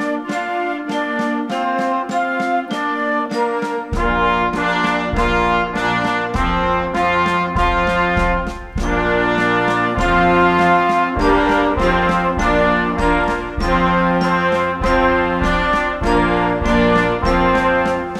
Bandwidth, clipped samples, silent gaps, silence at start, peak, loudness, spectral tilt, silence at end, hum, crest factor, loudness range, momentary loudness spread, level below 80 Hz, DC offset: 12.5 kHz; under 0.1%; none; 0 s; -2 dBFS; -17 LUFS; -6 dB/octave; 0 s; none; 14 dB; 4 LU; 6 LU; -28 dBFS; under 0.1%